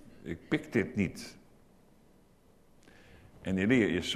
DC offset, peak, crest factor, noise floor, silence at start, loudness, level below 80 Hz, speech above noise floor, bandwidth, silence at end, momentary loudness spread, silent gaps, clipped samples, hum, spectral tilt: under 0.1%; -12 dBFS; 22 dB; -62 dBFS; 0.05 s; -31 LUFS; -60 dBFS; 31 dB; 13.5 kHz; 0 s; 17 LU; none; under 0.1%; none; -5.5 dB/octave